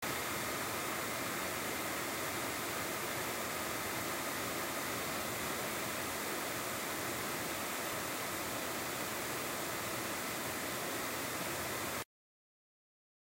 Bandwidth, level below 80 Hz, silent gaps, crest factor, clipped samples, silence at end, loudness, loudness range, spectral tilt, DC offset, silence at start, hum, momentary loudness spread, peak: 16 kHz; -66 dBFS; none; 16 dB; under 0.1%; 1.35 s; -37 LUFS; 1 LU; -2.5 dB/octave; under 0.1%; 0 s; none; 1 LU; -24 dBFS